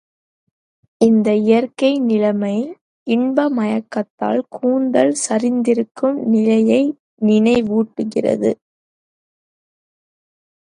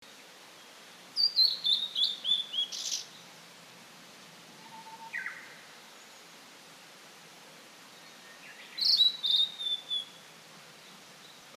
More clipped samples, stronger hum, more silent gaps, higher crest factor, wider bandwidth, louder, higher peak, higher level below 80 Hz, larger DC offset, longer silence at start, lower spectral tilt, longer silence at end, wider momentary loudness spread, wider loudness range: neither; neither; first, 2.81-3.06 s, 4.10-4.18 s, 5.91-5.95 s, 6.99-7.17 s vs none; about the same, 18 dB vs 20 dB; second, 11 kHz vs 15.5 kHz; first, -17 LUFS vs -27 LUFS; first, 0 dBFS vs -14 dBFS; first, -60 dBFS vs under -90 dBFS; neither; first, 1 s vs 0 s; first, -5.5 dB/octave vs 1 dB/octave; first, 2.25 s vs 0.05 s; second, 7 LU vs 27 LU; second, 4 LU vs 17 LU